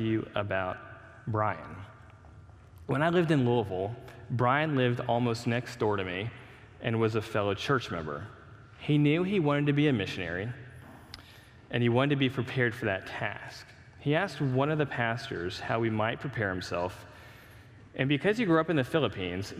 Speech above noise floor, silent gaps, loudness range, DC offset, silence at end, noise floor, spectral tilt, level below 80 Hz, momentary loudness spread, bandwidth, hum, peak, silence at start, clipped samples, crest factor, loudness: 24 dB; none; 3 LU; under 0.1%; 0 s; -53 dBFS; -7 dB/octave; -62 dBFS; 19 LU; 13.5 kHz; none; -10 dBFS; 0 s; under 0.1%; 20 dB; -30 LUFS